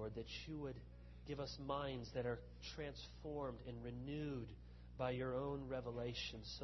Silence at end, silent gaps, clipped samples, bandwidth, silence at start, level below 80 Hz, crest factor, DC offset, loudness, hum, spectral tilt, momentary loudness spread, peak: 0 s; none; under 0.1%; 6 kHz; 0 s; -60 dBFS; 18 dB; under 0.1%; -48 LUFS; 60 Hz at -60 dBFS; -5 dB/octave; 9 LU; -28 dBFS